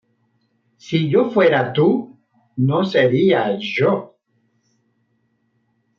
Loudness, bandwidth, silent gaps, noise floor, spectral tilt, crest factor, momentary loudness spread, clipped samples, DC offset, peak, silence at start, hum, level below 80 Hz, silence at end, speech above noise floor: -17 LUFS; 7 kHz; none; -66 dBFS; -7.5 dB/octave; 16 dB; 9 LU; under 0.1%; under 0.1%; -4 dBFS; 0.85 s; none; -66 dBFS; 1.95 s; 50 dB